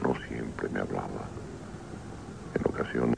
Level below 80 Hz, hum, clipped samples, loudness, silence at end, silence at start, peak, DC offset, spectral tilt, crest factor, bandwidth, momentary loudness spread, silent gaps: -50 dBFS; none; under 0.1%; -35 LUFS; 0 s; 0 s; -12 dBFS; 0.1%; -7 dB/octave; 20 dB; 10.5 kHz; 12 LU; none